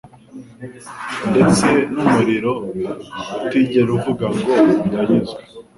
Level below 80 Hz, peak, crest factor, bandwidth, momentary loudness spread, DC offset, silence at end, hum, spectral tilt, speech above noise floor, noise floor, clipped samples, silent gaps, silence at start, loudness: -48 dBFS; -2 dBFS; 16 dB; 11.5 kHz; 17 LU; under 0.1%; 0.15 s; none; -6 dB/octave; 22 dB; -39 dBFS; under 0.1%; none; 0.05 s; -17 LUFS